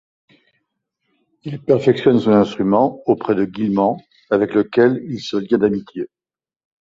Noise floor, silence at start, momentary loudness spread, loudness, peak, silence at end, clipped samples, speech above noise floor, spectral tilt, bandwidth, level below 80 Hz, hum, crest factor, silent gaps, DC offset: under -90 dBFS; 1.45 s; 16 LU; -17 LUFS; -2 dBFS; 0.75 s; under 0.1%; over 73 dB; -7.5 dB/octave; 7.6 kHz; -56 dBFS; none; 16 dB; none; under 0.1%